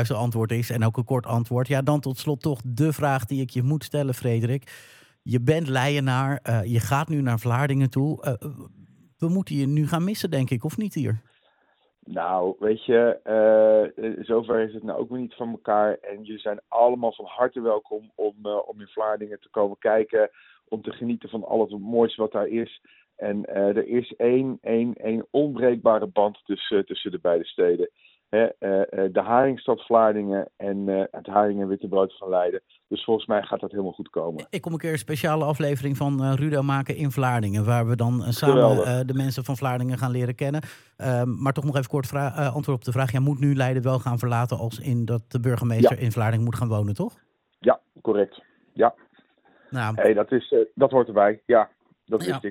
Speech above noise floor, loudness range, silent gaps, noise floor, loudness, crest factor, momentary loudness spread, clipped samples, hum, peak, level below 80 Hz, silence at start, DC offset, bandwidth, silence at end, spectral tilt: 43 dB; 4 LU; none; -66 dBFS; -24 LUFS; 20 dB; 10 LU; under 0.1%; none; -4 dBFS; -64 dBFS; 0 s; under 0.1%; 17 kHz; 0 s; -7 dB/octave